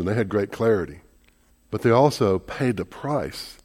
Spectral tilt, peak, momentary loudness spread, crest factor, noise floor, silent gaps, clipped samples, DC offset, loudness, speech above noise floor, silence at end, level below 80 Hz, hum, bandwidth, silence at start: -6.5 dB/octave; -4 dBFS; 12 LU; 20 dB; -59 dBFS; none; under 0.1%; under 0.1%; -23 LUFS; 36 dB; 0.1 s; -52 dBFS; none; 16.5 kHz; 0 s